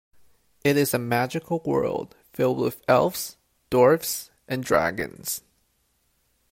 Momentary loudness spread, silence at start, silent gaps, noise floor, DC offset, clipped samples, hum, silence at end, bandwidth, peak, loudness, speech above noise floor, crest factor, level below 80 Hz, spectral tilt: 13 LU; 0.65 s; none; -69 dBFS; under 0.1%; under 0.1%; none; 1.15 s; 16.5 kHz; -6 dBFS; -24 LUFS; 46 dB; 20 dB; -58 dBFS; -5 dB/octave